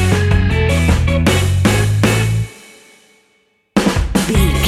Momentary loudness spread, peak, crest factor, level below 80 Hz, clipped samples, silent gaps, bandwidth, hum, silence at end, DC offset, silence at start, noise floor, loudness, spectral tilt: 4 LU; -2 dBFS; 14 dB; -22 dBFS; under 0.1%; none; 15.5 kHz; none; 0 s; under 0.1%; 0 s; -59 dBFS; -15 LUFS; -5.5 dB/octave